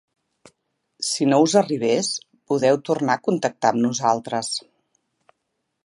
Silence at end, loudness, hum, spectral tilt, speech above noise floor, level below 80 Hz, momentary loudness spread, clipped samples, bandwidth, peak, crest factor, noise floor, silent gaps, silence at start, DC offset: 1.25 s; -21 LUFS; none; -4 dB/octave; 56 dB; -72 dBFS; 9 LU; under 0.1%; 11.5 kHz; -2 dBFS; 20 dB; -76 dBFS; none; 1 s; under 0.1%